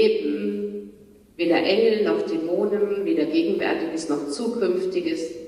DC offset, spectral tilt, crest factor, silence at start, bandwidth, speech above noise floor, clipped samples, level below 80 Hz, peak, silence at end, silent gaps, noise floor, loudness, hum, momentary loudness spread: under 0.1%; -5 dB/octave; 14 dB; 0 s; 12.5 kHz; 27 dB; under 0.1%; -64 dBFS; -8 dBFS; 0 s; none; -49 dBFS; -23 LUFS; none; 8 LU